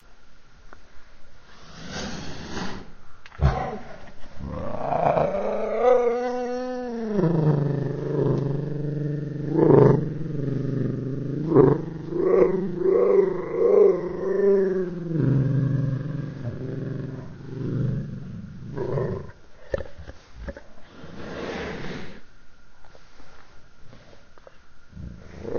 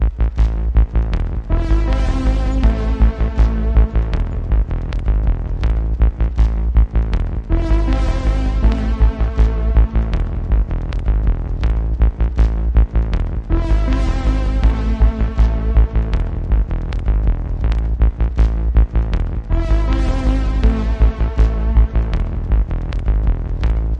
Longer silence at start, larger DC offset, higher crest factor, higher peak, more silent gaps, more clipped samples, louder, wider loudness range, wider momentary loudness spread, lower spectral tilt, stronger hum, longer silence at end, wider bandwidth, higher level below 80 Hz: about the same, 0.1 s vs 0 s; neither; first, 24 dB vs 14 dB; about the same, -2 dBFS vs -2 dBFS; neither; neither; second, -24 LUFS vs -19 LUFS; first, 17 LU vs 1 LU; first, 20 LU vs 5 LU; about the same, -8 dB/octave vs -8.5 dB/octave; neither; about the same, 0 s vs 0 s; first, 6.8 kHz vs 5.8 kHz; second, -42 dBFS vs -16 dBFS